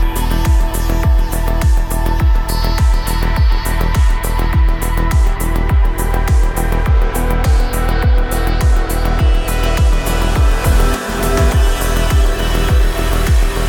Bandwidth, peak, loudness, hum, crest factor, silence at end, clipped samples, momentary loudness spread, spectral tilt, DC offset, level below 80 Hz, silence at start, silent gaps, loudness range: 18.5 kHz; -2 dBFS; -16 LUFS; none; 10 dB; 0 s; under 0.1%; 3 LU; -5.5 dB/octave; under 0.1%; -14 dBFS; 0 s; none; 1 LU